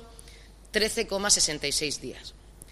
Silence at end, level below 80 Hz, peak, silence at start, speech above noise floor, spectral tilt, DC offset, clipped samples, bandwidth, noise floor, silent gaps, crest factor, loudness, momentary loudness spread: 0 s; -48 dBFS; -8 dBFS; 0 s; 21 dB; -1 dB/octave; under 0.1%; under 0.1%; 15.5 kHz; -49 dBFS; none; 22 dB; -25 LUFS; 20 LU